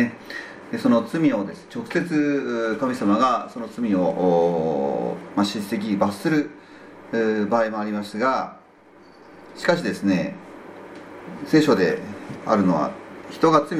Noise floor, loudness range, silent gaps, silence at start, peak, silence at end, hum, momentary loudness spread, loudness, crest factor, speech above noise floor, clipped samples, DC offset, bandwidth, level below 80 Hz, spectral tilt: -50 dBFS; 4 LU; none; 0 s; -2 dBFS; 0 s; none; 16 LU; -22 LUFS; 20 dB; 28 dB; under 0.1%; under 0.1%; 14.5 kHz; -62 dBFS; -6.5 dB/octave